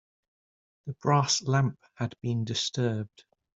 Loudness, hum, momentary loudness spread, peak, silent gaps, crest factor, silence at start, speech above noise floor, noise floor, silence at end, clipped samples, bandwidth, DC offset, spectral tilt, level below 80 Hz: -28 LUFS; none; 15 LU; -10 dBFS; none; 20 dB; 0.85 s; over 62 dB; under -90 dBFS; 0.5 s; under 0.1%; 7.8 kHz; under 0.1%; -4.5 dB/octave; -64 dBFS